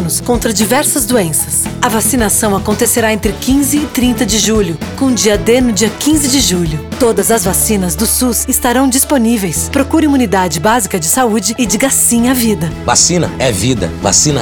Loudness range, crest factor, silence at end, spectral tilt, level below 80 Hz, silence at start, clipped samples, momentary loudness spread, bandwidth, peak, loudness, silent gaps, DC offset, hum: 1 LU; 10 dB; 0 s; -3.5 dB/octave; -30 dBFS; 0 s; under 0.1%; 5 LU; over 20 kHz; 0 dBFS; -11 LUFS; none; under 0.1%; none